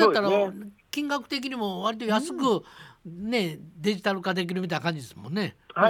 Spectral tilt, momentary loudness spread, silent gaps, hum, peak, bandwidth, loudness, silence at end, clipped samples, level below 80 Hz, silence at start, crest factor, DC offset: -5 dB/octave; 11 LU; none; none; -4 dBFS; 19 kHz; -28 LUFS; 0 s; under 0.1%; -68 dBFS; 0 s; 22 dB; under 0.1%